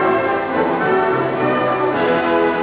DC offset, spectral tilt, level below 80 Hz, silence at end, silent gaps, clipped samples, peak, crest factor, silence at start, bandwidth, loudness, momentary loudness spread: under 0.1%; -9.5 dB/octave; -50 dBFS; 0 s; none; under 0.1%; -4 dBFS; 12 dB; 0 s; 4 kHz; -17 LUFS; 2 LU